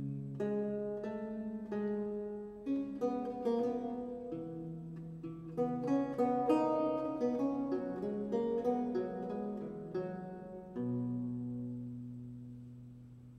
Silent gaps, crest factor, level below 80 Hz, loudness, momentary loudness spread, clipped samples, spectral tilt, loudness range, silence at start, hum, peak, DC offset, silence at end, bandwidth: none; 18 dB; -68 dBFS; -38 LUFS; 13 LU; under 0.1%; -9 dB/octave; 7 LU; 0 s; none; -18 dBFS; under 0.1%; 0 s; 9 kHz